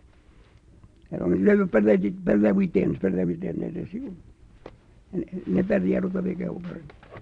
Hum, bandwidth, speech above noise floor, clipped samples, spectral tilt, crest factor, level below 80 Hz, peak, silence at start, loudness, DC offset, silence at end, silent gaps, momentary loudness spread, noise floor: none; 4.6 kHz; 30 dB; under 0.1%; -10 dB/octave; 16 dB; -52 dBFS; -8 dBFS; 1.1 s; -24 LUFS; under 0.1%; 0 s; none; 16 LU; -54 dBFS